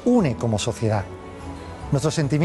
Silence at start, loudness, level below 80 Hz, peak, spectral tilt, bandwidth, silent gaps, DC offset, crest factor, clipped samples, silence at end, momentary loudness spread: 0 s; -23 LUFS; -44 dBFS; -8 dBFS; -6 dB/octave; 12.5 kHz; none; under 0.1%; 14 dB; under 0.1%; 0 s; 16 LU